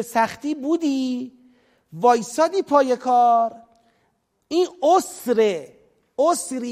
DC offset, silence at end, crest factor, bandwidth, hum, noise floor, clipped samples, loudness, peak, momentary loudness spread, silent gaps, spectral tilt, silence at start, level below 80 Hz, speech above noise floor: under 0.1%; 0 s; 18 dB; 15.5 kHz; none; -68 dBFS; under 0.1%; -20 LUFS; -4 dBFS; 9 LU; none; -4 dB/octave; 0 s; -70 dBFS; 48 dB